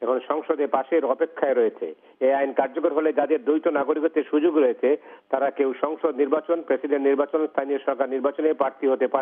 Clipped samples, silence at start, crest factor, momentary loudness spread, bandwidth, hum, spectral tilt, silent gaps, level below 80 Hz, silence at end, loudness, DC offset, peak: under 0.1%; 0 s; 16 dB; 4 LU; 3.7 kHz; none; -3 dB/octave; none; -88 dBFS; 0 s; -23 LUFS; under 0.1%; -6 dBFS